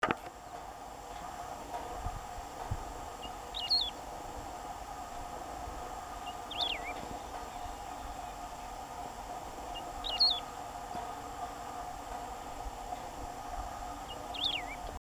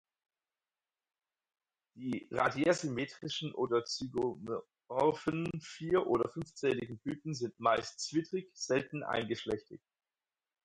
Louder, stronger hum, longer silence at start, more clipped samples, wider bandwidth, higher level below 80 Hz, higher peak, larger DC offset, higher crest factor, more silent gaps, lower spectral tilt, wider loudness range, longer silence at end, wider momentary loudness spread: second, -38 LUFS vs -35 LUFS; neither; second, 0 s vs 1.95 s; neither; first, over 20 kHz vs 11 kHz; first, -52 dBFS vs -68 dBFS; first, -12 dBFS vs -16 dBFS; neither; first, 28 dB vs 22 dB; neither; second, -2.5 dB/octave vs -5 dB/octave; first, 7 LU vs 2 LU; second, 0.15 s vs 0.9 s; first, 13 LU vs 10 LU